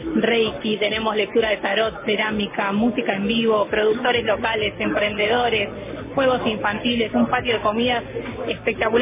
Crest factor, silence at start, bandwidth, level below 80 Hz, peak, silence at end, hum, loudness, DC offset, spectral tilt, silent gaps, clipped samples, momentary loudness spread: 16 dB; 0 s; 3.8 kHz; -46 dBFS; -6 dBFS; 0 s; none; -21 LUFS; under 0.1%; -8.5 dB/octave; none; under 0.1%; 4 LU